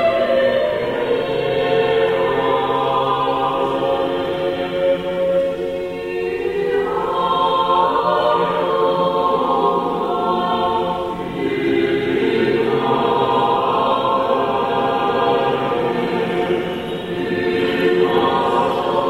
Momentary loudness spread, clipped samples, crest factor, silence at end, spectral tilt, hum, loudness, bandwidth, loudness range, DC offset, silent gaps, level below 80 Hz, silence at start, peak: 5 LU; under 0.1%; 14 dB; 0 s; -6.5 dB/octave; none; -18 LUFS; 15.5 kHz; 2 LU; 0.1%; none; -48 dBFS; 0 s; -4 dBFS